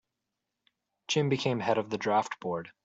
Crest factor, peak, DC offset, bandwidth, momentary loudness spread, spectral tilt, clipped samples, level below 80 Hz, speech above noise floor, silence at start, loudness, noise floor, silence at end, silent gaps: 18 dB; -14 dBFS; under 0.1%; 8 kHz; 8 LU; -5 dB/octave; under 0.1%; -72 dBFS; 56 dB; 1.1 s; -30 LUFS; -86 dBFS; 0.15 s; none